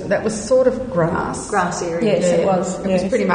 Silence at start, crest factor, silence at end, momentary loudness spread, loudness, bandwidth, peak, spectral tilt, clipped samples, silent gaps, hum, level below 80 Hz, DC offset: 0 s; 14 dB; 0 s; 4 LU; -18 LUFS; 9.8 kHz; -4 dBFS; -5.5 dB/octave; under 0.1%; none; none; -44 dBFS; under 0.1%